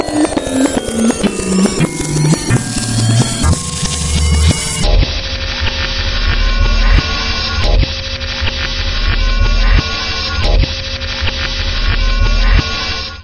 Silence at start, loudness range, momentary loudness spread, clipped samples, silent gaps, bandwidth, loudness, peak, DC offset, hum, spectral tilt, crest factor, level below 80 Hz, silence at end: 0 s; 2 LU; 5 LU; under 0.1%; none; 11.5 kHz; -15 LUFS; 0 dBFS; 0.2%; none; -4 dB/octave; 14 dB; -16 dBFS; 0 s